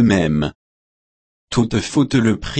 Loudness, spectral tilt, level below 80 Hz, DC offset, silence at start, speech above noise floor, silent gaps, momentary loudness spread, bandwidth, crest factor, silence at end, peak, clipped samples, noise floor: -18 LUFS; -6 dB/octave; -40 dBFS; under 0.1%; 0 s; over 74 dB; 0.55-1.48 s; 7 LU; 8.8 kHz; 14 dB; 0 s; -4 dBFS; under 0.1%; under -90 dBFS